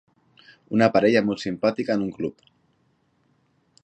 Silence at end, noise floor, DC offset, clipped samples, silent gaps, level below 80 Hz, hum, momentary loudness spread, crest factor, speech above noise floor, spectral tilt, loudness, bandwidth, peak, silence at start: 1.55 s; -66 dBFS; under 0.1%; under 0.1%; none; -62 dBFS; none; 12 LU; 22 dB; 45 dB; -6.5 dB/octave; -23 LUFS; 8.6 kHz; -4 dBFS; 0.7 s